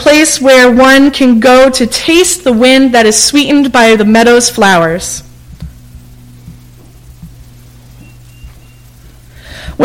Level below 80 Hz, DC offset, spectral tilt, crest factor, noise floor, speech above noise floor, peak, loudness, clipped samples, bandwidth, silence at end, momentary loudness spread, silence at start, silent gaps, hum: -36 dBFS; under 0.1%; -3 dB/octave; 8 dB; -36 dBFS; 30 dB; 0 dBFS; -6 LUFS; 0.2%; 17 kHz; 0 s; 8 LU; 0 s; none; none